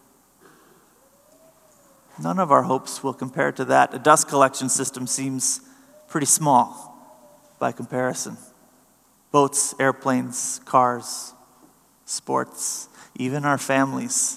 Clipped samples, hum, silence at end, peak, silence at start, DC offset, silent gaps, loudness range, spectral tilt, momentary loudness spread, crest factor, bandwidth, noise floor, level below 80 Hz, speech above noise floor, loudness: under 0.1%; none; 0 s; 0 dBFS; 2.15 s; under 0.1%; none; 6 LU; -3.5 dB/octave; 13 LU; 24 dB; 15 kHz; -59 dBFS; -76 dBFS; 37 dB; -22 LUFS